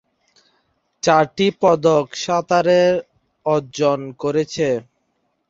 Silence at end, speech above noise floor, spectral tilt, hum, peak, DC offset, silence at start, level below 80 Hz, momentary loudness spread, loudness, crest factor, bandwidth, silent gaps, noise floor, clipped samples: 0.65 s; 52 dB; -5 dB/octave; none; -2 dBFS; under 0.1%; 1.05 s; -60 dBFS; 8 LU; -18 LUFS; 18 dB; 7.8 kHz; none; -69 dBFS; under 0.1%